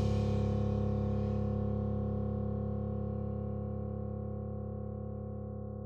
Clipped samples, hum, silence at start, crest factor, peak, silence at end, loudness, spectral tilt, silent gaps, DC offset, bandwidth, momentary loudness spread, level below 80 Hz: under 0.1%; none; 0 s; 14 dB; -20 dBFS; 0 s; -36 LUFS; -10 dB/octave; none; under 0.1%; 6.8 kHz; 9 LU; -44 dBFS